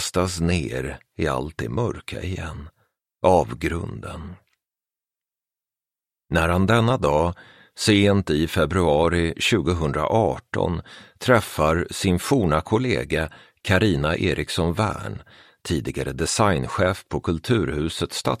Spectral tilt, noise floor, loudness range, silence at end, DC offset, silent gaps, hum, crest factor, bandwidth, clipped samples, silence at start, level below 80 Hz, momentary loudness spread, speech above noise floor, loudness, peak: -5.5 dB/octave; under -90 dBFS; 6 LU; 0 s; under 0.1%; none; none; 20 dB; 15.5 kHz; under 0.1%; 0 s; -40 dBFS; 13 LU; over 68 dB; -22 LUFS; -4 dBFS